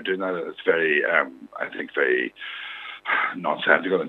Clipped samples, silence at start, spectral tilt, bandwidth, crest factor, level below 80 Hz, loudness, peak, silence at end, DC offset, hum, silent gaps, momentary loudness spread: under 0.1%; 0 s; -6.5 dB/octave; 4.4 kHz; 24 dB; -74 dBFS; -23 LUFS; 0 dBFS; 0 s; under 0.1%; none; none; 13 LU